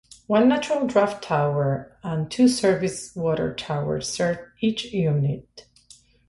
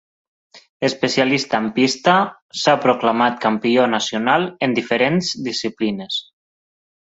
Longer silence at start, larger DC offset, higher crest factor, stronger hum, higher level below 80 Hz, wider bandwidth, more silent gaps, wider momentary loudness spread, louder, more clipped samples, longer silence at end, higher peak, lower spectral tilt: second, 0.3 s vs 0.55 s; neither; about the same, 18 dB vs 18 dB; neither; first, -54 dBFS vs -62 dBFS; first, 11.5 kHz vs 8 kHz; second, none vs 0.69-0.80 s, 2.42-2.49 s; about the same, 9 LU vs 7 LU; second, -23 LUFS vs -18 LUFS; neither; second, 0.7 s vs 0.9 s; second, -6 dBFS vs -2 dBFS; first, -6 dB/octave vs -4.5 dB/octave